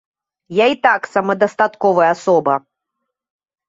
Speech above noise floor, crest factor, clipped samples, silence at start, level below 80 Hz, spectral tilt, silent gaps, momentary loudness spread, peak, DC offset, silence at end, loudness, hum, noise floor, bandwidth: 63 dB; 16 dB; under 0.1%; 0.5 s; -66 dBFS; -5.5 dB/octave; none; 6 LU; -2 dBFS; under 0.1%; 1.1 s; -16 LUFS; none; -78 dBFS; 8 kHz